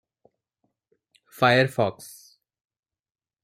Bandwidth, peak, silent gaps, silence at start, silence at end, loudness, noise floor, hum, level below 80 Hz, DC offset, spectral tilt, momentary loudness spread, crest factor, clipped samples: 16 kHz; -6 dBFS; none; 1.4 s; 1.35 s; -22 LUFS; under -90 dBFS; none; -68 dBFS; under 0.1%; -5.5 dB/octave; 24 LU; 22 dB; under 0.1%